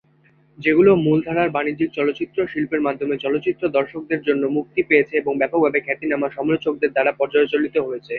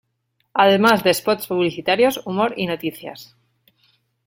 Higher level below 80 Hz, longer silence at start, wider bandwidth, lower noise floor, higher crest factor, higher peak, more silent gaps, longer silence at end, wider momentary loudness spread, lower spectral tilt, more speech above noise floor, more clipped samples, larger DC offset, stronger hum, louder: about the same, -58 dBFS vs -62 dBFS; about the same, 0.6 s vs 0.55 s; second, 4.6 kHz vs 17 kHz; second, -56 dBFS vs -70 dBFS; about the same, 18 dB vs 18 dB; about the same, -2 dBFS vs -2 dBFS; neither; second, 0 s vs 1 s; second, 7 LU vs 13 LU; first, -9 dB/octave vs -4.5 dB/octave; second, 37 dB vs 51 dB; neither; neither; neither; about the same, -20 LUFS vs -18 LUFS